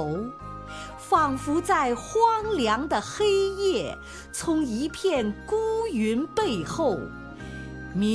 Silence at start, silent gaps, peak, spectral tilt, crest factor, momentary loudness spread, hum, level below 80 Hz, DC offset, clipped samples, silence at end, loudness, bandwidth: 0 s; none; -8 dBFS; -5 dB/octave; 18 dB; 15 LU; none; -46 dBFS; under 0.1%; under 0.1%; 0 s; -26 LUFS; 11 kHz